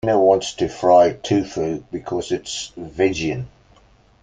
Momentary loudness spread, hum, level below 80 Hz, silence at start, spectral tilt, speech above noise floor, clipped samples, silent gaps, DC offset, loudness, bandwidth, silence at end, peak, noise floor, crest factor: 14 LU; none; -50 dBFS; 0.05 s; -5 dB/octave; 34 dB; under 0.1%; none; under 0.1%; -20 LUFS; 9.4 kHz; 0.75 s; -2 dBFS; -53 dBFS; 18 dB